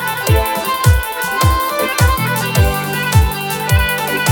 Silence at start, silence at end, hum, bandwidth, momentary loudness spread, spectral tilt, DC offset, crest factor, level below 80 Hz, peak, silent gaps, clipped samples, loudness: 0 s; 0 s; none; 19 kHz; 4 LU; -4.5 dB/octave; under 0.1%; 14 dB; -22 dBFS; 0 dBFS; none; under 0.1%; -15 LUFS